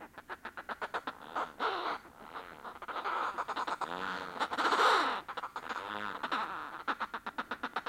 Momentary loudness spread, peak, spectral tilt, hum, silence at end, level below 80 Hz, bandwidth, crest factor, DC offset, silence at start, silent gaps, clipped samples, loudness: 16 LU; -16 dBFS; -2.5 dB/octave; none; 0 s; -70 dBFS; 16.5 kHz; 22 dB; under 0.1%; 0 s; none; under 0.1%; -36 LUFS